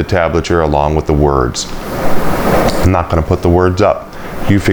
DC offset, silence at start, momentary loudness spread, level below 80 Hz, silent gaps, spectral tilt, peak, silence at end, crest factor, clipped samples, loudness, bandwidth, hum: under 0.1%; 0 s; 9 LU; -22 dBFS; none; -6 dB/octave; 0 dBFS; 0 s; 12 dB; under 0.1%; -13 LUFS; over 20 kHz; none